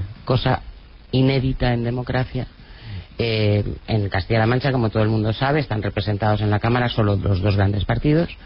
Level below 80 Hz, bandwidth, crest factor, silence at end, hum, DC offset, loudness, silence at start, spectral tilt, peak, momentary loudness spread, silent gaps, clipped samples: -36 dBFS; 5.6 kHz; 14 dB; 0 s; none; under 0.1%; -21 LUFS; 0 s; -10.5 dB/octave; -6 dBFS; 7 LU; none; under 0.1%